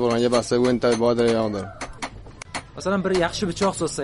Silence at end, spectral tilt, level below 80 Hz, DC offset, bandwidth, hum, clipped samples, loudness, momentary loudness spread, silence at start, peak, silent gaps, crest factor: 0 s; -5 dB/octave; -46 dBFS; under 0.1%; 11.5 kHz; none; under 0.1%; -22 LUFS; 15 LU; 0 s; -6 dBFS; none; 16 dB